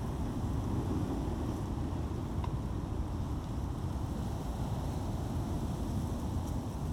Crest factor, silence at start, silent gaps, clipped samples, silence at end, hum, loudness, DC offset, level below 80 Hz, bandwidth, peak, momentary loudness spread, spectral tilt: 12 dB; 0 s; none; under 0.1%; 0 s; none; -37 LUFS; under 0.1%; -40 dBFS; 16.5 kHz; -22 dBFS; 3 LU; -7.5 dB/octave